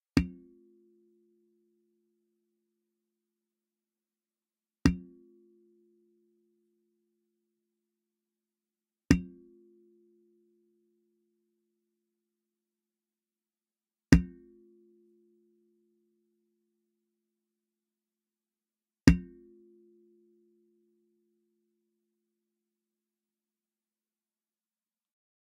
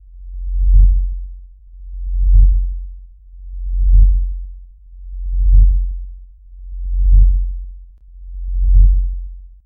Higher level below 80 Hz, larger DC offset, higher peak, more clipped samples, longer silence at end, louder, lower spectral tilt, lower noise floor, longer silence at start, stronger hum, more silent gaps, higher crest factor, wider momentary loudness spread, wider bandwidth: second, -48 dBFS vs -14 dBFS; neither; about the same, -2 dBFS vs 0 dBFS; neither; first, 6.25 s vs 0.2 s; second, -28 LUFS vs -17 LUFS; second, -7 dB/octave vs -15 dB/octave; first, under -90 dBFS vs -37 dBFS; about the same, 0.15 s vs 0.15 s; neither; neither; first, 36 dB vs 14 dB; second, 19 LU vs 22 LU; first, 2.2 kHz vs 0.2 kHz